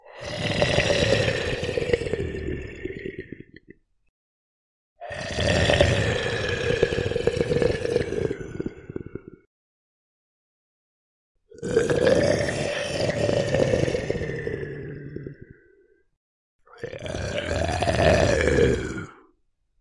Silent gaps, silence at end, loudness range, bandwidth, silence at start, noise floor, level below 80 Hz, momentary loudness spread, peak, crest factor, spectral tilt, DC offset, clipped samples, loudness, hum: 4.09-4.96 s, 9.47-11.35 s, 16.17-16.59 s; 0.65 s; 11 LU; 11.5 kHz; 0.05 s; -68 dBFS; -42 dBFS; 17 LU; -4 dBFS; 22 dB; -5 dB/octave; under 0.1%; under 0.1%; -24 LUFS; none